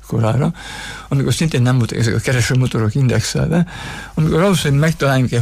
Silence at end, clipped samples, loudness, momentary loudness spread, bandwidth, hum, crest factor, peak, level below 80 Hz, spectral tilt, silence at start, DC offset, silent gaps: 0 s; under 0.1%; -16 LUFS; 8 LU; 15.5 kHz; none; 10 dB; -4 dBFS; -36 dBFS; -6 dB/octave; 0 s; under 0.1%; none